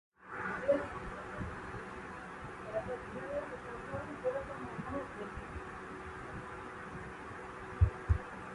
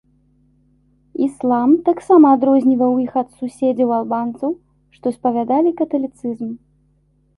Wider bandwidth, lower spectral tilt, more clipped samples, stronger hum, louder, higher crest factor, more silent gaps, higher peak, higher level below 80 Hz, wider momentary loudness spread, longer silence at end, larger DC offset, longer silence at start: about the same, 11.5 kHz vs 11.5 kHz; about the same, -7.5 dB/octave vs -8 dB/octave; neither; neither; second, -40 LUFS vs -17 LUFS; first, 24 dB vs 16 dB; neither; second, -16 dBFS vs -2 dBFS; first, -46 dBFS vs -60 dBFS; second, 12 LU vs 15 LU; second, 0 s vs 0.8 s; neither; second, 0.2 s vs 1.2 s